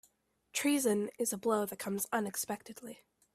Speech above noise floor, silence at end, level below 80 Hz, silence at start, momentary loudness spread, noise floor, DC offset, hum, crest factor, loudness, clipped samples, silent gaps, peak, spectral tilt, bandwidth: 37 dB; 0.4 s; -76 dBFS; 0.55 s; 15 LU; -71 dBFS; under 0.1%; none; 18 dB; -34 LUFS; under 0.1%; none; -18 dBFS; -3.5 dB/octave; 16 kHz